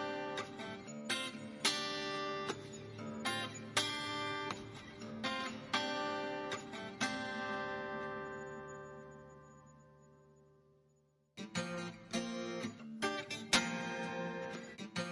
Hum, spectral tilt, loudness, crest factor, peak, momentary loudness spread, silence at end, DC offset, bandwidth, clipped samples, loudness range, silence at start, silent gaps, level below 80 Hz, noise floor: none; -3 dB/octave; -40 LUFS; 28 dB; -14 dBFS; 14 LU; 0 s; under 0.1%; 11.5 kHz; under 0.1%; 10 LU; 0 s; none; -74 dBFS; -74 dBFS